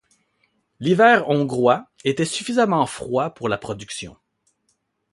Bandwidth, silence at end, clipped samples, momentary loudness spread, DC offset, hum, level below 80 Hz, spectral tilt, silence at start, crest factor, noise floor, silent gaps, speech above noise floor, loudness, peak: 11.5 kHz; 1.05 s; under 0.1%; 16 LU; under 0.1%; none; -58 dBFS; -5 dB/octave; 0.8 s; 18 dB; -70 dBFS; none; 51 dB; -20 LUFS; -2 dBFS